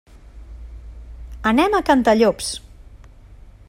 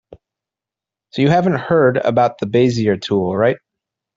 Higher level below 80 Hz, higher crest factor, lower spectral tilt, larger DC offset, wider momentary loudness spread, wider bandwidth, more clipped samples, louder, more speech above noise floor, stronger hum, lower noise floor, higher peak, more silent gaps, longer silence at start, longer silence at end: first, -38 dBFS vs -54 dBFS; about the same, 18 dB vs 16 dB; second, -4.5 dB/octave vs -7 dB/octave; neither; first, 24 LU vs 4 LU; first, 16 kHz vs 7.6 kHz; neither; about the same, -18 LUFS vs -16 LUFS; second, 27 dB vs 72 dB; neither; second, -43 dBFS vs -87 dBFS; about the same, -2 dBFS vs -2 dBFS; neither; first, 0.25 s vs 0.1 s; second, 0.35 s vs 0.6 s